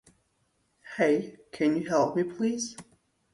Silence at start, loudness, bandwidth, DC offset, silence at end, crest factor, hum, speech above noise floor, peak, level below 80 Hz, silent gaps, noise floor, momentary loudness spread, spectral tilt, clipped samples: 0.85 s; -28 LUFS; 11.5 kHz; under 0.1%; 0.5 s; 18 dB; none; 45 dB; -12 dBFS; -70 dBFS; none; -73 dBFS; 16 LU; -5 dB/octave; under 0.1%